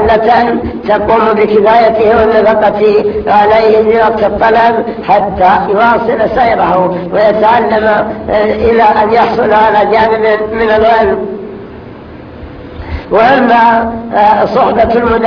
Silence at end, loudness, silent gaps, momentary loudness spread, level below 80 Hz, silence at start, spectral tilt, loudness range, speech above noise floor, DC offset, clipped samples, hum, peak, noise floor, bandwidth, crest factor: 0 s; -8 LUFS; none; 8 LU; -32 dBFS; 0 s; -7.5 dB/octave; 4 LU; 20 dB; under 0.1%; 1%; none; 0 dBFS; -28 dBFS; 5.4 kHz; 8 dB